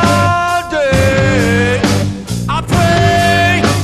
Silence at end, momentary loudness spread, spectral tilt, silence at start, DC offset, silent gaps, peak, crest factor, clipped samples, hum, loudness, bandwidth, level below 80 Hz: 0 s; 7 LU; -5.5 dB/octave; 0 s; under 0.1%; none; 0 dBFS; 12 dB; under 0.1%; none; -12 LUFS; 13 kHz; -28 dBFS